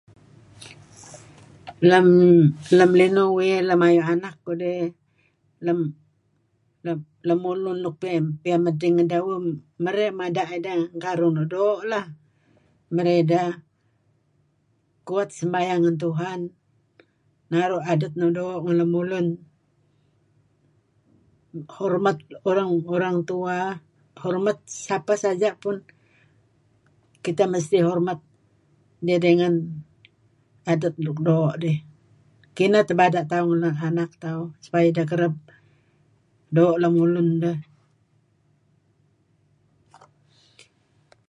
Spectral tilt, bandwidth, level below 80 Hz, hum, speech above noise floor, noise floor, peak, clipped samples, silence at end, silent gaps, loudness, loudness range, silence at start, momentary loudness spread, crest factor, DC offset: -7 dB/octave; 10.5 kHz; -70 dBFS; none; 46 dB; -67 dBFS; -4 dBFS; under 0.1%; 3.65 s; none; -22 LUFS; 9 LU; 0.6 s; 15 LU; 20 dB; under 0.1%